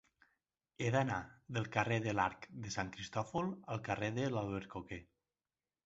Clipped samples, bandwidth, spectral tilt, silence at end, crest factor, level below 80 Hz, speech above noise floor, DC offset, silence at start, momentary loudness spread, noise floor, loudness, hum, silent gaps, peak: under 0.1%; 8 kHz; -5 dB/octave; 0.85 s; 24 dB; -64 dBFS; over 52 dB; under 0.1%; 0.8 s; 11 LU; under -90 dBFS; -39 LUFS; none; none; -16 dBFS